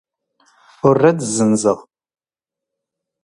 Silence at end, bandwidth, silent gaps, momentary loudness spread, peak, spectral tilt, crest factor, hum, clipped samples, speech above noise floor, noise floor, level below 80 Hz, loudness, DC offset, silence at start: 1.45 s; 11.5 kHz; none; 6 LU; 0 dBFS; -5.5 dB/octave; 20 dB; none; under 0.1%; 73 dB; -88 dBFS; -58 dBFS; -16 LUFS; under 0.1%; 0.85 s